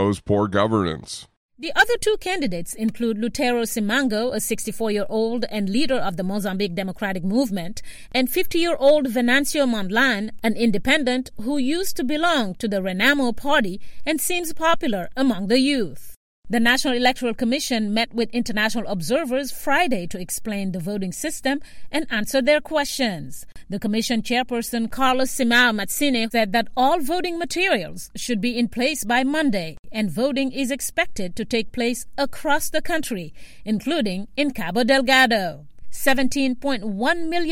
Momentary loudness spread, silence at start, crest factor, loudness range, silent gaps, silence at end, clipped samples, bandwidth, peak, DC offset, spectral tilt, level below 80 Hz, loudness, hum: 9 LU; 0 s; 16 dB; 4 LU; 1.37-1.49 s, 16.16-16.42 s, 29.79-29.83 s; 0 s; under 0.1%; 16.5 kHz; -4 dBFS; under 0.1%; -4 dB/octave; -46 dBFS; -22 LUFS; none